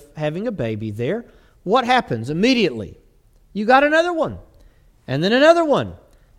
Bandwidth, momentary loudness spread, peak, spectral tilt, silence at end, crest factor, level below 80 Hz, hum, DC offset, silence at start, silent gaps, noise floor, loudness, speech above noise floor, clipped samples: 13 kHz; 18 LU; 0 dBFS; -5.5 dB/octave; 0.45 s; 20 dB; -50 dBFS; none; under 0.1%; 0.15 s; none; -53 dBFS; -18 LUFS; 35 dB; under 0.1%